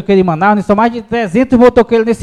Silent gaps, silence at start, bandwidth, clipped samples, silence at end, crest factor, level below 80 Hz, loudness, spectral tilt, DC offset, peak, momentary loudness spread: none; 0 s; 11 kHz; 0.8%; 0 s; 10 dB; -38 dBFS; -10 LUFS; -7.5 dB/octave; under 0.1%; 0 dBFS; 6 LU